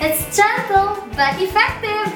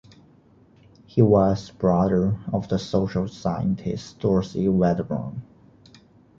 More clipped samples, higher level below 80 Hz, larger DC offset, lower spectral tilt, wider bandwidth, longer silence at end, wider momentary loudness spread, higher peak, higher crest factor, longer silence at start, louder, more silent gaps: neither; first, -40 dBFS vs -46 dBFS; neither; second, -3 dB/octave vs -8.5 dB/octave; first, 19 kHz vs 7.4 kHz; second, 0 s vs 0.95 s; second, 4 LU vs 10 LU; first, 0 dBFS vs -4 dBFS; about the same, 16 dB vs 20 dB; second, 0 s vs 1.15 s; first, -17 LUFS vs -23 LUFS; neither